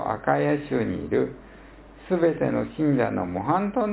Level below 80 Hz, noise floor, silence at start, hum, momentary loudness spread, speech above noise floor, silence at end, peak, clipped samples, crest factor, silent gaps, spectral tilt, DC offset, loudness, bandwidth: -50 dBFS; -46 dBFS; 0 s; none; 5 LU; 22 dB; 0 s; -6 dBFS; under 0.1%; 18 dB; none; -11.5 dB/octave; under 0.1%; -25 LUFS; 4 kHz